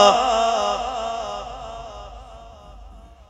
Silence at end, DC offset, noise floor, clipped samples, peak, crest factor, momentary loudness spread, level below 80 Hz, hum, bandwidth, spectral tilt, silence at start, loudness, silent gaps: 0.05 s; under 0.1%; -43 dBFS; under 0.1%; 0 dBFS; 22 dB; 25 LU; -44 dBFS; none; 11 kHz; -2.5 dB/octave; 0 s; -22 LUFS; none